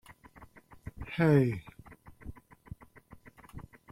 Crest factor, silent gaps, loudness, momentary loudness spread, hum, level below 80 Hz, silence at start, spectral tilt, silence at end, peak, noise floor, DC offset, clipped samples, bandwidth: 22 dB; none; -29 LUFS; 26 LU; none; -56 dBFS; 0.1 s; -8.5 dB/octave; 0.3 s; -12 dBFS; -56 dBFS; under 0.1%; under 0.1%; 14.5 kHz